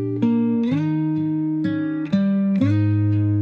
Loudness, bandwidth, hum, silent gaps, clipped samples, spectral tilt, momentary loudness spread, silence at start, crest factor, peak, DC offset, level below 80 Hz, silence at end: -20 LUFS; 5.4 kHz; none; none; under 0.1%; -10 dB/octave; 4 LU; 0 s; 12 dB; -8 dBFS; under 0.1%; -62 dBFS; 0 s